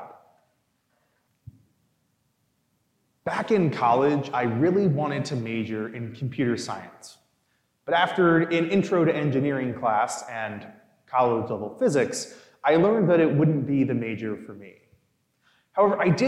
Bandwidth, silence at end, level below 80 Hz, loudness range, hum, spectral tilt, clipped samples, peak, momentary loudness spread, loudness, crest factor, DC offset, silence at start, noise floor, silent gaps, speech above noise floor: 12.5 kHz; 0 s; -70 dBFS; 5 LU; none; -6.5 dB/octave; under 0.1%; -8 dBFS; 13 LU; -24 LUFS; 18 dB; under 0.1%; 0 s; -71 dBFS; none; 48 dB